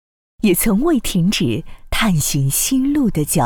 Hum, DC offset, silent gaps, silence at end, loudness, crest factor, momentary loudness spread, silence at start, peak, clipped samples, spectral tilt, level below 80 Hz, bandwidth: none; under 0.1%; none; 0 s; -17 LUFS; 12 dB; 5 LU; 0.4 s; -6 dBFS; under 0.1%; -4.5 dB/octave; -32 dBFS; over 20 kHz